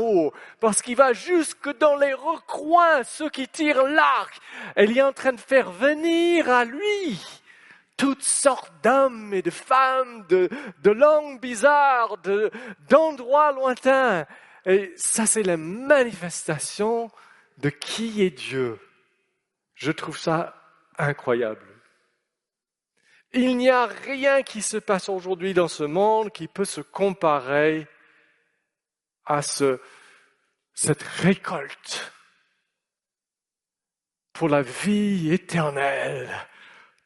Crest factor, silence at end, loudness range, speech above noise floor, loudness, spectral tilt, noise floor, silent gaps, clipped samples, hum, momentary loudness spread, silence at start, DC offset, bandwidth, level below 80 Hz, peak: 22 dB; 0.6 s; 8 LU; over 68 dB; -22 LUFS; -4 dB/octave; under -90 dBFS; none; under 0.1%; none; 12 LU; 0 s; under 0.1%; 11.5 kHz; -68 dBFS; -2 dBFS